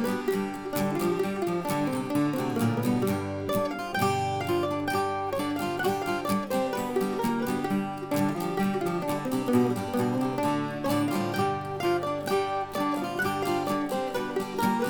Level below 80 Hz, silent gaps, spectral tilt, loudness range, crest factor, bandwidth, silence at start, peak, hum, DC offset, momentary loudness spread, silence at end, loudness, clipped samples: -58 dBFS; none; -6 dB/octave; 1 LU; 16 dB; over 20 kHz; 0 s; -12 dBFS; none; under 0.1%; 3 LU; 0 s; -28 LUFS; under 0.1%